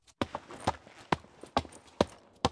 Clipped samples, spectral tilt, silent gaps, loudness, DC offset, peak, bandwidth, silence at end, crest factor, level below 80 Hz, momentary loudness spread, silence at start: under 0.1%; -5 dB/octave; none; -35 LUFS; under 0.1%; -8 dBFS; 11 kHz; 0 s; 28 dB; -54 dBFS; 5 LU; 0.2 s